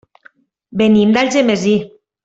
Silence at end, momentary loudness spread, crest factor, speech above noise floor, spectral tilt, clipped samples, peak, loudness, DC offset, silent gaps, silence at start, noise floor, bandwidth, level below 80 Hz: 0.4 s; 12 LU; 12 dB; 37 dB; -5.5 dB/octave; under 0.1%; -2 dBFS; -13 LUFS; under 0.1%; none; 0.7 s; -50 dBFS; 8 kHz; -54 dBFS